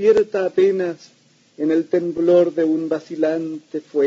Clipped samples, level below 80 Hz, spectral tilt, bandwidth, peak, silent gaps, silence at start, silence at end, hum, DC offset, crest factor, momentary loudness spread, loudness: under 0.1%; -64 dBFS; -7 dB/octave; 7.6 kHz; -4 dBFS; none; 0 s; 0 s; none; under 0.1%; 16 dB; 11 LU; -19 LUFS